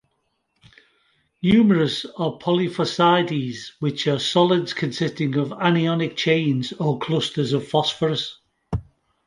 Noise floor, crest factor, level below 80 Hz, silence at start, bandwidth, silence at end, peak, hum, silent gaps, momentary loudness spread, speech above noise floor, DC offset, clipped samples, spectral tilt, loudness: -72 dBFS; 20 dB; -50 dBFS; 1.45 s; 11.5 kHz; 0.45 s; -2 dBFS; none; none; 9 LU; 51 dB; under 0.1%; under 0.1%; -6 dB/octave; -21 LUFS